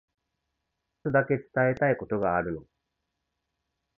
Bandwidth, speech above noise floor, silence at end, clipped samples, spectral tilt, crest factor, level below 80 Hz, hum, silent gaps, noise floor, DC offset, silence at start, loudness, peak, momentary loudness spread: 6 kHz; 56 dB; 1.35 s; under 0.1%; -10.5 dB/octave; 20 dB; -58 dBFS; none; none; -82 dBFS; under 0.1%; 1.05 s; -27 LUFS; -10 dBFS; 11 LU